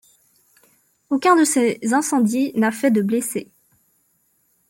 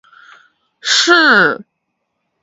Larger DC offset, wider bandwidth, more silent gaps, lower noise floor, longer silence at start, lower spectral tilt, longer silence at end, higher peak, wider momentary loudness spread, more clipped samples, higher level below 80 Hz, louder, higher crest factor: neither; first, 17 kHz vs 8 kHz; neither; second, -64 dBFS vs -71 dBFS; first, 1.1 s vs 0.85 s; first, -4.5 dB/octave vs -1.5 dB/octave; first, 1.25 s vs 0.8 s; second, -4 dBFS vs 0 dBFS; second, 9 LU vs 16 LU; neither; about the same, -70 dBFS vs -68 dBFS; second, -19 LUFS vs -10 LUFS; about the same, 16 dB vs 16 dB